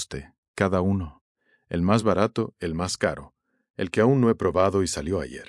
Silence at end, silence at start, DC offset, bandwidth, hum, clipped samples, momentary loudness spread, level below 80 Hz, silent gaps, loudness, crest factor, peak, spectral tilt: 0.05 s; 0 s; under 0.1%; 12 kHz; none; under 0.1%; 16 LU; -50 dBFS; 0.38-0.54 s, 1.21-1.35 s, 3.70-3.74 s; -24 LUFS; 20 dB; -6 dBFS; -6 dB/octave